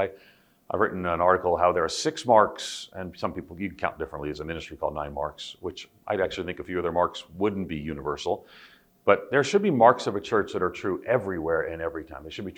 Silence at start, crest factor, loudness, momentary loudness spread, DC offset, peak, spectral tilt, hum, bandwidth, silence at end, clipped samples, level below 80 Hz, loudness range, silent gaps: 0 s; 24 dB; -26 LUFS; 14 LU; under 0.1%; -2 dBFS; -5 dB/octave; none; 16.5 kHz; 0.05 s; under 0.1%; -54 dBFS; 8 LU; none